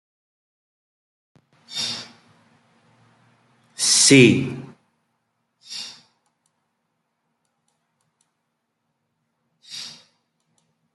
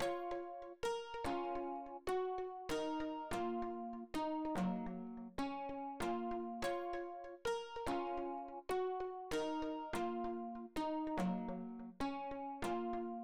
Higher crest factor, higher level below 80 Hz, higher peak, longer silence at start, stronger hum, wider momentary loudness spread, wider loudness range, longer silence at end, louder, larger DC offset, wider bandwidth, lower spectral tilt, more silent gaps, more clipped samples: first, 24 dB vs 12 dB; about the same, -66 dBFS vs -62 dBFS; first, -2 dBFS vs -32 dBFS; first, 1.7 s vs 0 s; neither; first, 26 LU vs 6 LU; first, 23 LU vs 1 LU; first, 1.05 s vs 0 s; first, -16 LUFS vs -43 LUFS; second, under 0.1% vs 0.1%; second, 12 kHz vs over 20 kHz; second, -3 dB/octave vs -5.5 dB/octave; neither; neither